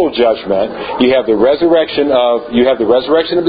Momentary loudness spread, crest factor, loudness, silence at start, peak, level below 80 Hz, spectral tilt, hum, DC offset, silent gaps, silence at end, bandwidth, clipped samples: 4 LU; 12 dB; -12 LUFS; 0 s; 0 dBFS; -44 dBFS; -8.5 dB/octave; none; under 0.1%; none; 0 s; 5 kHz; under 0.1%